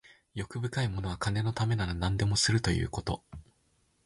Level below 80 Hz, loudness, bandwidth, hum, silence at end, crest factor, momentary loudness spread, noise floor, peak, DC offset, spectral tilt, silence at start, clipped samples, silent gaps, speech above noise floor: -44 dBFS; -31 LUFS; 11.5 kHz; none; 0.65 s; 18 dB; 14 LU; -71 dBFS; -14 dBFS; under 0.1%; -4.5 dB/octave; 0.35 s; under 0.1%; none; 41 dB